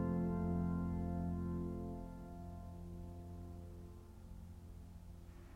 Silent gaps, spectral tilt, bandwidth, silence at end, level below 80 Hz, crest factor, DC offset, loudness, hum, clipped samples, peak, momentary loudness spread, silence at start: none; -10 dB/octave; 8.8 kHz; 0 s; -54 dBFS; 16 dB; under 0.1%; -44 LUFS; none; under 0.1%; -28 dBFS; 17 LU; 0 s